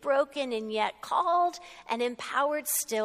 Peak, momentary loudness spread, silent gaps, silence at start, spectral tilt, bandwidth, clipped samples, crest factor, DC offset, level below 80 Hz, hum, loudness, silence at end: -14 dBFS; 6 LU; none; 0 s; -1.5 dB/octave; 15.5 kHz; under 0.1%; 16 dB; under 0.1%; -72 dBFS; none; -29 LUFS; 0 s